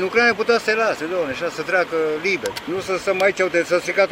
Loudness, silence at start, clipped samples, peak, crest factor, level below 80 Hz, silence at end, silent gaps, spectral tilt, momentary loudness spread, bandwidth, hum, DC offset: -20 LUFS; 0 s; under 0.1%; -4 dBFS; 16 dB; -58 dBFS; 0 s; none; -3.5 dB/octave; 8 LU; 16 kHz; none; under 0.1%